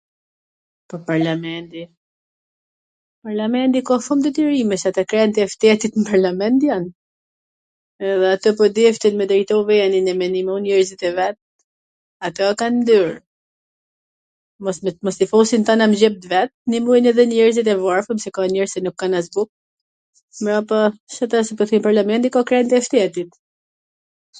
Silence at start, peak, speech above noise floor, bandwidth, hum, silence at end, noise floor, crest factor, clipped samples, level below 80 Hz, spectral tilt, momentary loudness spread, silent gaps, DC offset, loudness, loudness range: 0.9 s; 0 dBFS; over 73 dB; 9.4 kHz; none; 1.1 s; under -90 dBFS; 18 dB; under 0.1%; -64 dBFS; -5 dB/octave; 11 LU; 1.97-3.22 s, 6.95-7.99 s, 11.42-12.20 s, 13.27-14.59 s, 16.54-16.65 s, 19.49-20.13 s, 20.23-20.28 s, 21.00-21.07 s; under 0.1%; -17 LUFS; 6 LU